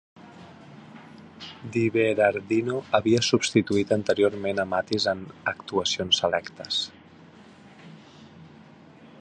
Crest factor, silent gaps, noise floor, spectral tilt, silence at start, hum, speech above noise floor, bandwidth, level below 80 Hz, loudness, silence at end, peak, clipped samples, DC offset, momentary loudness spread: 22 dB; none; -50 dBFS; -4 dB/octave; 0.2 s; none; 25 dB; 9.6 kHz; -60 dBFS; -24 LUFS; 0.15 s; -6 dBFS; under 0.1%; under 0.1%; 18 LU